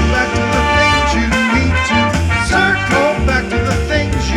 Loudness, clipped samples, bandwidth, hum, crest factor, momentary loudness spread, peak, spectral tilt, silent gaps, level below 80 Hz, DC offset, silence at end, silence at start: -13 LUFS; under 0.1%; 13 kHz; none; 14 dB; 4 LU; 0 dBFS; -5 dB/octave; none; -22 dBFS; under 0.1%; 0 s; 0 s